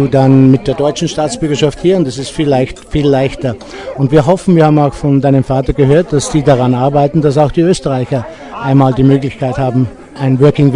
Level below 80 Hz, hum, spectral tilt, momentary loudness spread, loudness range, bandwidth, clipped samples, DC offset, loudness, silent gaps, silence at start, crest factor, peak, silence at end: -32 dBFS; none; -7 dB/octave; 8 LU; 3 LU; 11 kHz; 1%; under 0.1%; -11 LUFS; none; 0 s; 10 dB; 0 dBFS; 0 s